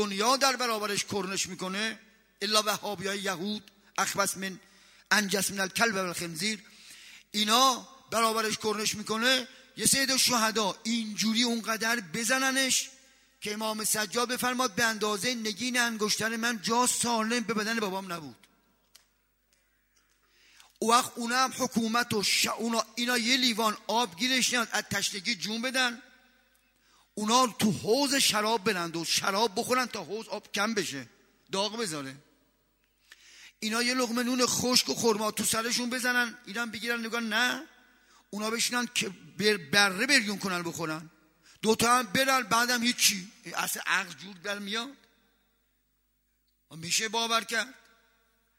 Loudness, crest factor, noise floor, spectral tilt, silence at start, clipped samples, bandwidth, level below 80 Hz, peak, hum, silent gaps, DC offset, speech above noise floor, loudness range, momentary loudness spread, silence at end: -28 LUFS; 26 dB; -74 dBFS; -2 dB/octave; 0 s; under 0.1%; 16 kHz; -70 dBFS; -4 dBFS; 50 Hz at -75 dBFS; none; under 0.1%; 45 dB; 7 LU; 12 LU; 0.85 s